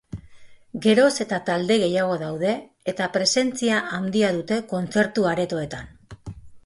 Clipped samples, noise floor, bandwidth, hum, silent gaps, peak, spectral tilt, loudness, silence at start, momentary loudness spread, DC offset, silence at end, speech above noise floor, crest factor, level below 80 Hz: under 0.1%; -45 dBFS; 11.5 kHz; none; none; -4 dBFS; -4.5 dB/octave; -22 LUFS; 0.15 s; 20 LU; under 0.1%; 0.05 s; 23 dB; 18 dB; -54 dBFS